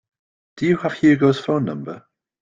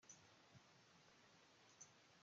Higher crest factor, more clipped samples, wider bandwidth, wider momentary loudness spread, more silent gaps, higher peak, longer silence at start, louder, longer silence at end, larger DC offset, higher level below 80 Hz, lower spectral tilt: second, 16 dB vs 22 dB; neither; about the same, 7.6 kHz vs 7.6 kHz; first, 17 LU vs 5 LU; neither; first, -4 dBFS vs -48 dBFS; first, 0.55 s vs 0 s; first, -19 LUFS vs -67 LUFS; first, 0.45 s vs 0 s; neither; first, -60 dBFS vs under -90 dBFS; first, -7.5 dB/octave vs -2.5 dB/octave